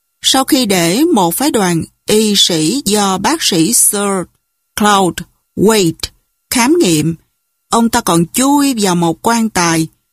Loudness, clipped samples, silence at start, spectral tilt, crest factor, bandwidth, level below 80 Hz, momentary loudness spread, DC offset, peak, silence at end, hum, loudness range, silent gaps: -12 LUFS; under 0.1%; 0.25 s; -3.5 dB/octave; 12 dB; 15.5 kHz; -44 dBFS; 9 LU; under 0.1%; 0 dBFS; 0.25 s; none; 2 LU; none